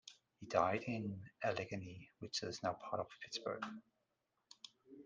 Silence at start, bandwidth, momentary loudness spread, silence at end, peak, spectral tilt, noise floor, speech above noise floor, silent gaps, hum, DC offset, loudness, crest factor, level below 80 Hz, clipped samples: 0.05 s; 9.6 kHz; 20 LU; 0 s; -18 dBFS; -4.5 dB/octave; -86 dBFS; 44 dB; none; none; under 0.1%; -42 LUFS; 26 dB; -80 dBFS; under 0.1%